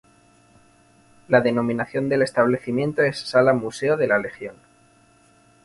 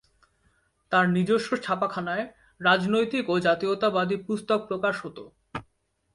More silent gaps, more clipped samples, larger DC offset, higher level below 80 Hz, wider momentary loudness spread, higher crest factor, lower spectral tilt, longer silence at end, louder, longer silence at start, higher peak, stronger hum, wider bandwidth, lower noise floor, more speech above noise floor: neither; neither; neither; about the same, -62 dBFS vs -64 dBFS; second, 6 LU vs 17 LU; about the same, 20 dB vs 18 dB; about the same, -6 dB/octave vs -6 dB/octave; first, 1.1 s vs 0.55 s; first, -21 LUFS vs -25 LUFS; first, 1.3 s vs 0.9 s; first, -2 dBFS vs -8 dBFS; neither; about the same, 11.5 kHz vs 11.5 kHz; second, -56 dBFS vs -70 dBFS; second, 35 dB vs 45 dB